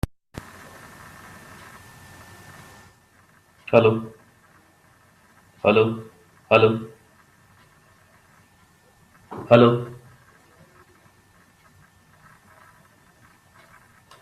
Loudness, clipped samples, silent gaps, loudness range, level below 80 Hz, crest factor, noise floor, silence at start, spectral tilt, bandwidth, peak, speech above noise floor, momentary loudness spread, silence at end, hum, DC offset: -19 LUFS; under 0.1%; none; 4 LU; -52 dBFS; 26 dB; -57 dBFS; 3.7 s; -7 dB/octave; 14 kHz; 0 dBFS; 40 dB; 28 LU; 4.25 s; none; under 0.1%